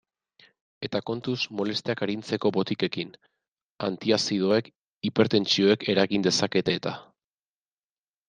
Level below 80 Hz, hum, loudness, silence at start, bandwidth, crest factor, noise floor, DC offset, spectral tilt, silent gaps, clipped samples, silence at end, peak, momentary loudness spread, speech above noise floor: -68 dBFS; none; -26 LUFS; 0.8 s; 9.8 kHz; 22 dB; under -90 dBFS; under 0.1%; -4.5 dB/octave; 3.48-3.75 s, 4.76-5.01 s; under 0.1%; 1.25 s; -6 dBFS; 11 LU; over 64 dB